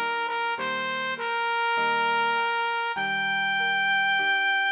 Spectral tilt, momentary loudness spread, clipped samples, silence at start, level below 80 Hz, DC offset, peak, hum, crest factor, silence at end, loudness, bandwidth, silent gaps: 1.5 dB/octave; 5 LU; under 0.1%; 0 s; -78 dBFS; under 0.1%; -14 dBFS; none; 12 dB; 0 s; -24 LUFS; 4 kHz; none